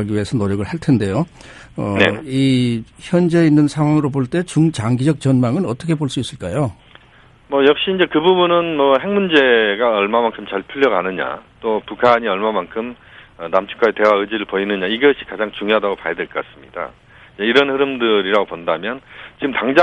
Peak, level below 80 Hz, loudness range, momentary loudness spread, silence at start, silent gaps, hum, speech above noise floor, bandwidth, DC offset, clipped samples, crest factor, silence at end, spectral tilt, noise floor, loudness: 0 dBFS; -52 dBFS; 4 LU; 12 LU; 0 s; none; none; 31 dB; 11.5 kHz; under 0.1%; under 0.1%; 16 dB; 0 s; -6.5 dB/octave; -48 dBFS; -17 LUFS